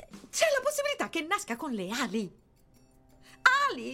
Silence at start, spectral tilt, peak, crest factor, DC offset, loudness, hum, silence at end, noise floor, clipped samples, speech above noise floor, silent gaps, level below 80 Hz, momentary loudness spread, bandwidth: 0 s; -2.5 dB/octave; -8 dBFS; 22 dB; under 0.1%; -29 LUFS; none; 0 s; -61 dBFS; under 0.1%; 28 dB; none; -66 dBFS; 11 LU; 16.5 kHz